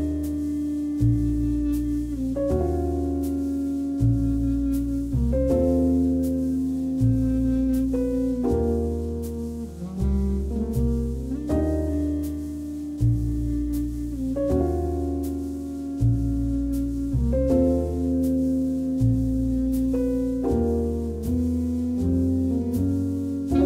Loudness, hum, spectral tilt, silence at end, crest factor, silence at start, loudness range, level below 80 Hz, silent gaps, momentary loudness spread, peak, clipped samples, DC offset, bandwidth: -25 LUFS; none; -9.5 dB/octave; 0 s; 14 dB; 0 s; 3 LU; -32 dBFS; none; 6 LU; -10 dBFS; under 0.1%; under 0.1%; 15.5 kHz